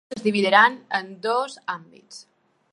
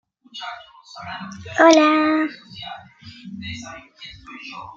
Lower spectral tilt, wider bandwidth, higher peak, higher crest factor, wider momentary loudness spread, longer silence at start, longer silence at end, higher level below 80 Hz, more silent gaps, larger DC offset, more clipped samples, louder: about the same, -4 dB/octave vs -4 dB/octave; first, 11.5 kHz vs 7.6 kHz; about the same, -2 dBFS vs -2 dBFS; about the same, 22 dB vs 20 dB; second, 16 LU vs 26 LU; second, 0.1 s vs 0.35 s; first, 0.55 s vs 0.05 s; second, -76 dBFS vs -60 dBFS; neither; neither; neither; second, -21 LUFS vs -16 LUFS